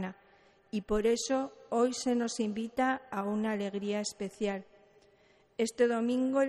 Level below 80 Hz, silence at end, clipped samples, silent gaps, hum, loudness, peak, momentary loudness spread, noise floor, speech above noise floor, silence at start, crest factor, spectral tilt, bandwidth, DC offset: -58 dBFS; 0 s; under 0.1%; none; none; -32 LUFS; -14 dBFS; 8 LU; -65 dBFS; 34 dB; 0 s; 18 dB; -4.5 dB/octave; 13 kHz; under 0.1%